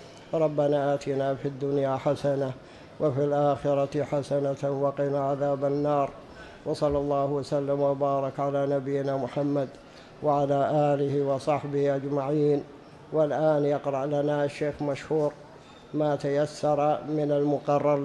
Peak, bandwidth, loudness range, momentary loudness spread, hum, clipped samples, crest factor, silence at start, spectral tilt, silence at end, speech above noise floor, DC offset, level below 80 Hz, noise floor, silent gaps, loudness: -12 dBFS; 11 kHz; 1 LU; 6 LU; none; under 0.1%; 14 dB; 0 s; -7.5 dB/octave; 0 s; 23 dB; under 0.1%; -58 dBFS; -49 dBFS; none; -27 LUFS